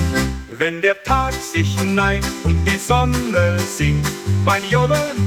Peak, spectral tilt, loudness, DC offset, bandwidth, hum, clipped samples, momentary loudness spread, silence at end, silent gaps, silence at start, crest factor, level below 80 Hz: -2 dBFS; -5 dB/octave; -18 LUFS; under 0.1%; 18.5 kHz; none; under 0.1%; 4 LU; 0 s; none; 0 s; 16 dB; -30 dBFS